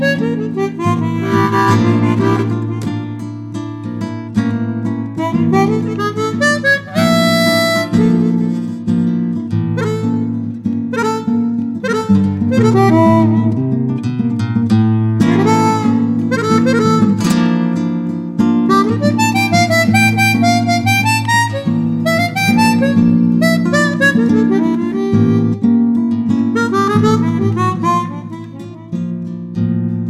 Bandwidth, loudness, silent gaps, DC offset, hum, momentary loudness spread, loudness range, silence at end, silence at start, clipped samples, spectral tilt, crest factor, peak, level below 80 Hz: 15 kHz; -14 LUFS; none; under 0.1%; none; 9 LU; 5 LU; 0 s; 0 s; under 0.1%; -6 dB/octave; 12 dB; 0 dBFS; -50 dBFS